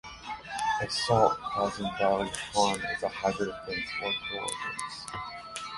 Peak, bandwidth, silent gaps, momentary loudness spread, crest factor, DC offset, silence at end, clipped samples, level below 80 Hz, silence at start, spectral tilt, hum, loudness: -10 dBFS; 12 kHz; none; 12 LU; 22 dB; under 0.1%; 0 s; under 0.1%; -56 dBFS; 0.05 s; -3.5 dB/octave; none; -30 LUFS